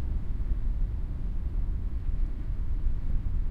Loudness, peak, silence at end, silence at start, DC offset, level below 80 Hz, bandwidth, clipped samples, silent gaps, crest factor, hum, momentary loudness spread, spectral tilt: -35 LUFS; -16 dBFS; 0 s; 0 s; under 0.1%; -28 dBFS; 2.6 kHz; under 0.1%; none; 12 dB; none; 2 LU; -9.5 dB/octave